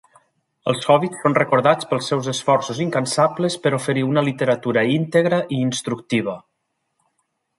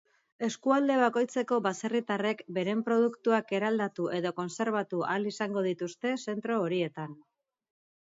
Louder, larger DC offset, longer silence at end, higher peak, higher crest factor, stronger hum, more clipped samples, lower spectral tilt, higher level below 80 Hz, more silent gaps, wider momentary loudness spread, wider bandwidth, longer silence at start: first, -20 LUFS vs -30 LUFS; neither; first, 1.2 s vs 0.95 s; first, -2 dBFS vs -12 dBFS; about the same, 18 dB vs 18 dB; neither; neither; about the same, -5.5 dB/octave vs -5.5 dB/octave; first, -64 dBFS vs -80 dBFS; neither; about the same, 6 LU vs 7 LU; first, 11.5 kHz vs 7.8 kHz; first, 0.65 s vs 0.4 s